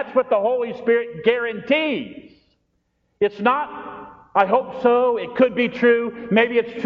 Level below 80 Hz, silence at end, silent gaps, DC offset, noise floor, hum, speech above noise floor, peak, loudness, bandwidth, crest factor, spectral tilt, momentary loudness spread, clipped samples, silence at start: -62 dBFS; 0 s; none; under 0.1%; -69 dBFS; none; 50 dB; -2 dBFS; -20 LUFS; 5.6 kHz; 18 dB; -3 dB/octave; 8 LU; under 0.1%; 0 s